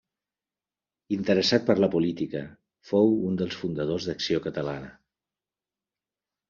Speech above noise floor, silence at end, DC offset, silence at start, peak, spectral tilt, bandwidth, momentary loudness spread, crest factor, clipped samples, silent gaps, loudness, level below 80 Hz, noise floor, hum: over 65 dB; 1.6 s; under 0.1%; 1.1 s; -6 dBFS; -5 dB/octave; 7.2 kHz; 12 LU; 22 dB; under 0.1%; none; -26 LUFS; -62 dBFS; under -90 dBFS; none